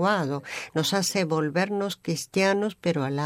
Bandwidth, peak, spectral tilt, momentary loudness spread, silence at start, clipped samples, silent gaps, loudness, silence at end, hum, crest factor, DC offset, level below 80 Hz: 16 kHz; -10 dBFS; -4.5 dB/octave; 7 LU; 0 s; under 0.1%; none; -26 LUFS; 0 s; none; 16 dB; under 0.1%; -70 dBFS